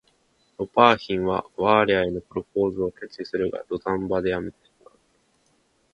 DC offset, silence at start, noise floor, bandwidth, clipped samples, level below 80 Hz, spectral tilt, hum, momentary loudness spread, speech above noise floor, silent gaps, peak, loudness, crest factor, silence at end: under 0.1%; 0.6 s; -66 dBFS; 8 kHz; under 0.1%; -52 dBFS; -7 dB/octave; none; 13 LU; 43 dB; none; 0 dBFS; -23 LUFS; 24 dB; 1.45 s